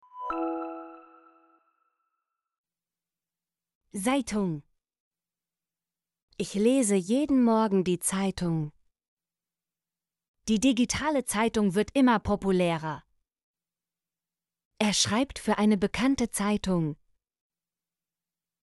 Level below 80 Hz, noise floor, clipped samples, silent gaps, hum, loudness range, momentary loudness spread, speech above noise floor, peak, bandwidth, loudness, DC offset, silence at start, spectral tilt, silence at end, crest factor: -54 dBFS; under -90 dBFS; under 0.1%; 2.58-2.64 s, 3.75-3.81 s, 5.00-5.11 s, 6.22-6.28 s, 9.08-9.17 s, 10.28-10.34 s, 13.44-13.54 s, 14.65-14.71 s; none; 8 LU; 13 LU; over 64 dB; -10 dBFS; 11.5 kHz; -27 LUFS; under 0.1%; 0.15 s; -4.5 dB/octave; 1.7 s; 18 dB